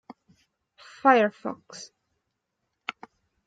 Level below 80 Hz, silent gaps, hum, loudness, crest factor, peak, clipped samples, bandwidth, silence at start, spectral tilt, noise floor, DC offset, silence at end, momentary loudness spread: -82 dBFS; none; none; -23 LUFS; 24 dB; -4 dBFS; under 0.1%; 9.2 kHz; 1.05 s; -4.5 dB/octave; -80 dBFS; under 0.1%; 0.55 s; 23 LU